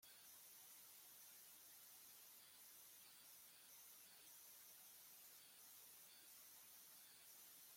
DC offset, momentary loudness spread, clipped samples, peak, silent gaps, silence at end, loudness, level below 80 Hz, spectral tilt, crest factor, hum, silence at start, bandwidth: under 0.1%; 1 LU; under 0.1%; -52 dBFS; none; 0 s; -62 LUFS; under -90 dBFS; 1 dB/octave; 14 dB; none; 0 s; 16.5 kHz